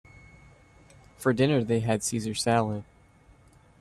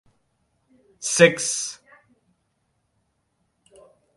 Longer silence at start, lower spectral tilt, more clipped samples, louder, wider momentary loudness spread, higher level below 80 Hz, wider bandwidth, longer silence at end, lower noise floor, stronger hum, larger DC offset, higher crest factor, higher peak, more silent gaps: first, 1.2 s vs 1 s; first, -5 dB/octave vs -3 dB/octave; neither; second, -27 LUFS vs -20 LUFS; second, 7 LU vs 15 LU; first, -58 dBFS vs -70 dBFS; first, 14 kHz vs 11.5 kHz; second, 1 s vs 2.45 s; second, -57 dBFS vs -72 dBFS; neither; neither; second, 18 dB vs 26 dB; second, -12 dBFS vs -2 dBFS; neither